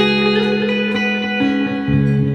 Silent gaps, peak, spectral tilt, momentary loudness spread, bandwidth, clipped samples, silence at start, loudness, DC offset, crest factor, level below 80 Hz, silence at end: none; -2 dBFS; -7 dB/octave; 3 LU; 8 kHz; under 0.1%; 0 s; -16 LUFS; under 0.1%; 14 dB; -40 dBFS; 0 s